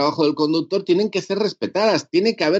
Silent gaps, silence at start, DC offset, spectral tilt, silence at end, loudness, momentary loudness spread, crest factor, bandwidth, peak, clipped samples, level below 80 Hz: none; 0 s; under 0.1%; -5 dB/octave; 0 s; -20 LUFS; 4 LU; 14 dB; 8 kHz; -6 dBFS; under 0.1%; -70 dBFS